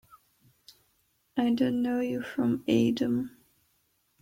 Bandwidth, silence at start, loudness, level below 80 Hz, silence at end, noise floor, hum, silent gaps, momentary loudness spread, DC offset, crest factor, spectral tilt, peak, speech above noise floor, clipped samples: 16 kHz; 1.35 s; -28 LUFS; -68 dBFS; 0.95 s; -72 dBFS; none; none; 7 LU; under 0.1%; 18 dB; -6.5 dB/octave; -12 dBFS; 45 dB; under 0.1%